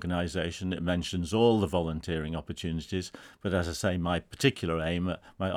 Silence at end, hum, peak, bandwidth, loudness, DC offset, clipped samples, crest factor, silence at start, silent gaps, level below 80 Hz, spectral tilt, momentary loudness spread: 0 s; none; -10 dBFS; 14.5 kHz; -30 LUFS; under 0.1%; under 0.1%; 20 dB; 0 s; none; -52 dBFS; -5.5 dB/octave; 10 LU